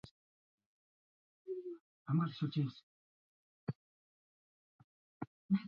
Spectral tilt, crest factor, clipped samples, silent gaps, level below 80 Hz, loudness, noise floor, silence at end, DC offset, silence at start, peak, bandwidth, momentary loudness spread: -7.5 dB/octave; 20 dB; under 0.1%; 0.11-0.58 s, 0.66-1.45 s, 1.81-2.06 s, 2.83-3.67 s, 3.75-5.20 s, 5.27-5.49 s; -78 dBFS; -41 LUFS; under -90 dBFS; 0 s; under 0.1%; 0.05 s; -22 dBFS; 6.6 kHz; 18 LU